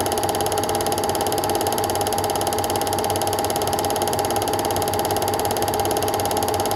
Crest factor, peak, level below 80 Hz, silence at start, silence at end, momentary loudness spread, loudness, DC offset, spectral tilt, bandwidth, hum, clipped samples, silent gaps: 18 dB; -4 dBFS; -46 dBFS; 0 s; 0 s; 0 LU; -21 LUFS; under 0.1%; -3.5 dB/octave; 17 kHz; none; under 0.1%; none